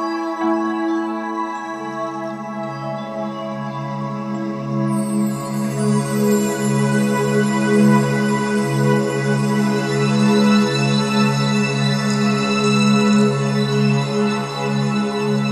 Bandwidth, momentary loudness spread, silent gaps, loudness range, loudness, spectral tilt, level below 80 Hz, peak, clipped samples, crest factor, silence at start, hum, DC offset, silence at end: 13 kHz; 11 LU; none; 8 LU; -19 LUFS; -6 dB/octave; -58 dBFS; -4 dBFS; under 0.1%; 14 dB; 0 s; none; under 0.1%; 0 s